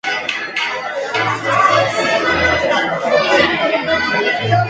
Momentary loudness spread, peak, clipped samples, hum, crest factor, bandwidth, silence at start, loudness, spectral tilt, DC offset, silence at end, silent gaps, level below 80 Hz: 7 LU; 0 dBFS; under 0.1%; none; 16 dB; 9.4 kHz; 0.05 s; -15 LUFS; -4 dB/octave; under 0.1%; 0 s; none; -42 dBFS